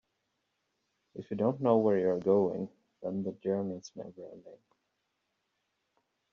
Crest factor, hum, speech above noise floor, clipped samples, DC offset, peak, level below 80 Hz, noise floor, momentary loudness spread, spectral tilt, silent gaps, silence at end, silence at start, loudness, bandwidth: 22 dB; none; 50 dB; under 0.1%; under 0.1%; -12 dBFS; -76 dBFS; -81 dBFS; 21 LU; -8.5 dB/octave; none; 1.8 s; 1.15 s; -31 LUFS; 7 kHz